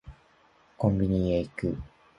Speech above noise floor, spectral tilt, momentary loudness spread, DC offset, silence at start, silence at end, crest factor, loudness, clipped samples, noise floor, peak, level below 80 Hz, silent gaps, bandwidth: 35 dB; -9.5 dB/octave; 8 LU; under 0.1%; 0.05 s; 0.3 s; 20 dB; -28 LUFS; under 0.1%; -62 dBFS; -10 dBFS; -44 dBFS; none; 10.5 kHz